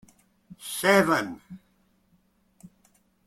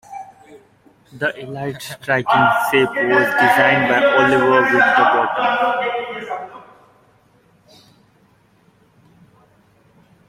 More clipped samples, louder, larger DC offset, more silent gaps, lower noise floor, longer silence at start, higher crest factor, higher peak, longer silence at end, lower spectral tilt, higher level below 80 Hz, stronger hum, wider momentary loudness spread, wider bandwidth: neither; second, -23 LUFS vs -15 LUFS; neither; neither; first, -66 dBFS vs -55 dBFS; first, 0.6 s vs 0.1 s; first, 24 dB vs 16 dB; second, -6 dBFS vs -2 dBFS; second, 1.7 s vs 3.65 s; about the same, -4 dB/octave vs -5 dB/octave; second, -66 dBFS vs -60 dBFS; neither; first, 22 LU vs 15 LU; about the same, 16.5 kHz vs 16 kHz